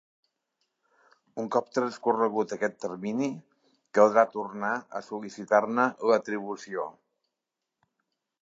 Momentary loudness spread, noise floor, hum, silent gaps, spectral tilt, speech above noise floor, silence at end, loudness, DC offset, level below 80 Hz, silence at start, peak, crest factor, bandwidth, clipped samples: 15 LU; -86 dBFS; none; none; -5.5 dB/octave; 59 dB; 1.5 s; -28 LUFS; under 0.1%; -82 dBFS; 1.35 s; -6 dBFS; 24 dB; 7.8 kHz; under 0.1%